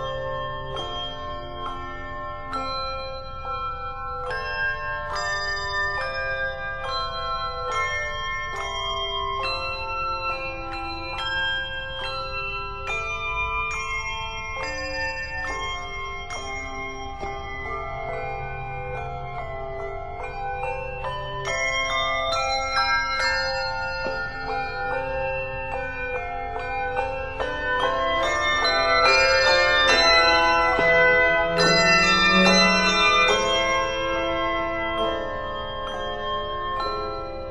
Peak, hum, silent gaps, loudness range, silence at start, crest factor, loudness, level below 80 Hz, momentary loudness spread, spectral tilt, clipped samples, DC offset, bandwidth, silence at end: -4 dBFS; none; none; 14 LU; 0 s; 20 dB; -23 LUFS; -38 dBFS; 15 LU; -3 dB/octave; under 0.1%; under 0.1%; 12 kHz; 0 s